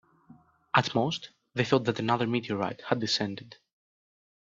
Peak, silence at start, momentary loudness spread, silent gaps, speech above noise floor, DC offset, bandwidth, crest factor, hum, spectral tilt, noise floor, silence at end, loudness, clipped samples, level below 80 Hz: -4 dBFS; 0.3 s; 9 LU; none; 29 dB; under 0.1%; 7.8 kHz; 26 dB; none; -5 dB/octave; -58 dBFS; 1.05 s; -29 LUFS; under 0.1%; -68 dBFS